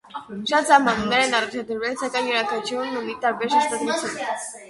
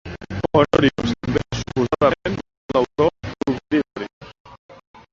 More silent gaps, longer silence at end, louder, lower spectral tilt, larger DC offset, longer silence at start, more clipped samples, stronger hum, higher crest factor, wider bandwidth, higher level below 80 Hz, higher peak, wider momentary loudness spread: second, none vs 2.57-2.69 s, 4.13-4.21 s, 4.40-4.45 s, 4.59-4.69 s; second, 0 s vs 0.4 s; about the same, -22 LUFS vs -21 LUFS; second, -2.5 dB/octave vs -6.5 dB/octave; neither; about the same, 0.1 s vs 0.05 s; neither; neither; about the same, 20 dB vs 20 dB; first, 11.5 kHz vs 7.8 kHz; second, -58 dBFS vs -42 dBFS; about the same, -2 dBFS vs -2 dBFS; about the same, 11 LU vs 13 LU